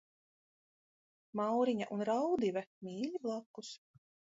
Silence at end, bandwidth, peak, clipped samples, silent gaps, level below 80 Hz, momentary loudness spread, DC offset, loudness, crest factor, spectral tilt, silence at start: 0.55 s; 7.6 kHz; -22 dBFS; under 0.1%; 2.67-2.81 s, 3.46-3.54 s; -82 dBFS; 16 LU; under 0.1%; -37 LUFS; 16 dB; -5 dB/octave; 1.35 s